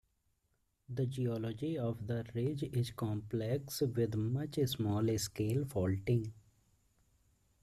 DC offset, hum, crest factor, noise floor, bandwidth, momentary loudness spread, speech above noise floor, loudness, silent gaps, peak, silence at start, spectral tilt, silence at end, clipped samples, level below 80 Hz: under 0.1%; none; 16 dB; -79 dBFS; 15 kHz; 5 LU; 43 dB; -37 LUFS; none; -22 dBFS; 0.9 s; -6.5 dB/octave; 1.25 s; under 0.1%; -64 dBFS